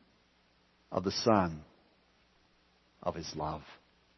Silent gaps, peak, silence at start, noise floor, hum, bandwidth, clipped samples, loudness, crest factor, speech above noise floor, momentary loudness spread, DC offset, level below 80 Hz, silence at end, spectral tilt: none; -12 dBFS; 0.9 s; -69 dBFS; none; 6.2 kHz; under 0.1%; -34 LUFS; 24 dB; 36 dB; 17 LU; under 0.1%; -60 dBFS; 0.4 s; -5 dB/octave